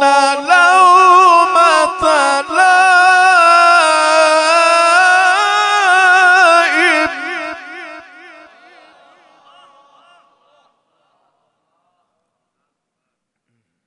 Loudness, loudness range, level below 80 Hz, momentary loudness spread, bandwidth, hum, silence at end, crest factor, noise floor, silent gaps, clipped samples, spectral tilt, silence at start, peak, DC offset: -9 LUFS; 9 LU; -60 dBFS; 9 LU; 11 kHz; none; 5.85 s; 12 dB; -75 dBFS; none; under 0.1%; 0 dB/octave; 0 s; 0 dBFS; under 0.1%